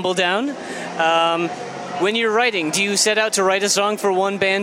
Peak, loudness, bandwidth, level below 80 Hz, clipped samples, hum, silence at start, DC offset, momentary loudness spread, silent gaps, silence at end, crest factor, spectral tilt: -2 dBFS; -18 LUFS; 16.5 kHz; -76 dBFS; under 0.1%; none; 0 s; under 0.1%; 10 LU; none; 0 s; 16 dB; -2.5 dB/octave